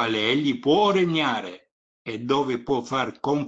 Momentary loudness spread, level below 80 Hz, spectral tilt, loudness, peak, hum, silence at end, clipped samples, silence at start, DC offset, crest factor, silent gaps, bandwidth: 14 LU; -62 dBFS; -5.5 dB/octave; -23 LUFS; -8 dBFS; none; 0 s; under 0.1%; 0 s; under 0.1%; 16 dB; 1.71-2.05 s; 8 kHz